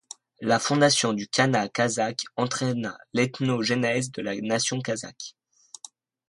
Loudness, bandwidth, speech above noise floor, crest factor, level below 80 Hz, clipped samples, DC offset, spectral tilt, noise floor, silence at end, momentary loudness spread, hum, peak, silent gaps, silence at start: -25 LUFS; 11.5 kHz; 25 dB; 18 dB; -66 dBFS; under 0.1%; under 0.1%; -4 dB/octave; -50 dBFS; 1 s; 19 LU; none; -8 dBFS; none; 0.4 s